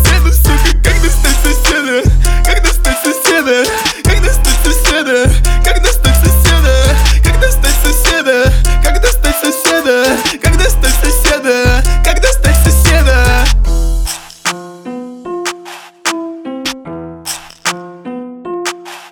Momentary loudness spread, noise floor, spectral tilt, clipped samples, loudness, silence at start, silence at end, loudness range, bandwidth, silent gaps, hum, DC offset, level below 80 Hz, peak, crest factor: 14 LU; -31 dBFS; -4 dB/octave; under 0.1%; -11 LUFS; 0 s; 0.05 s; 10 LU; 19.5 kHz; none; none; under 0.1%; -12 dBFS; 0 dBFS; 10 dB